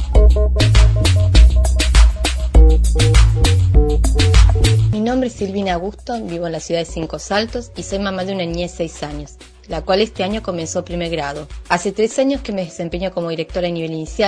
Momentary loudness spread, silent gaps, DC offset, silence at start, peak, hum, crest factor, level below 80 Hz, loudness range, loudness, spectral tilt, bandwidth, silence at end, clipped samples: 12 LU; none; under 0.1%; 0 s; 0 dBFS; none; 14 dB; -16 dBFS; 9 LU; -17 LUFS; -5.5 dB/octave; 11 kHz; 0 s; under 0.1%